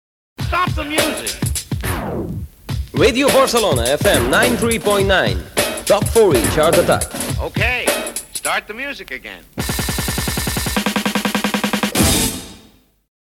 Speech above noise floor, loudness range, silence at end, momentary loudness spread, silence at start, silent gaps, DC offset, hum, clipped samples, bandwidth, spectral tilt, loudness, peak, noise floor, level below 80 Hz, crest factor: 33 dB; 6 LU; 0.65 s; 13 LU; 0.4 s; none; under 0.1%; none; under 0.1%; 18.5 kHz; -3.5 dB/octave; -17 LUFS; 0 dBFS; -49 dBFS; -32 dBFS; 16 dB